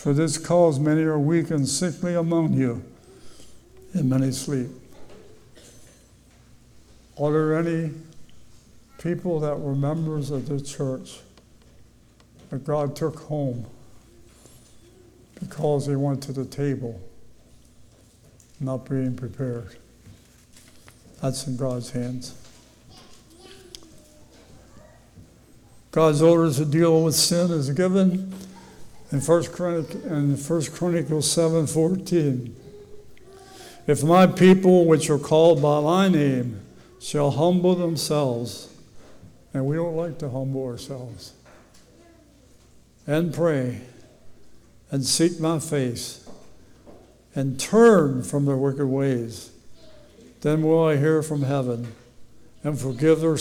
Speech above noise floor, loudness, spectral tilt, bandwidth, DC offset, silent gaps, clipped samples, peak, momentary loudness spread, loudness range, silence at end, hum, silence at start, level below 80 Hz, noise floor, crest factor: 33 dB; -22 LUFS; -6 dB/octave; 17 kHz; under 0.1%; none; under 0.1%; -6 dBFS; 18 LU; 13 LU; 0 s; none; 0 s; -56 dBFS; -54 dBFS; 18 dB